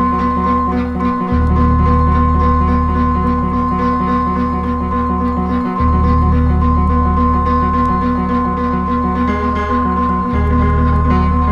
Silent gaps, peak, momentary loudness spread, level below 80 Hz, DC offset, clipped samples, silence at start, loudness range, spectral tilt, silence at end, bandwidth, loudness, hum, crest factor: none; -2 dBFS; 4 LU; -18 dBFS; under 0.1%; under 0.1%; 0 s; 1 LU; -9.5 dB/octave; 0 s; 5.2 kHz; -15 LUFS; none; 12 dB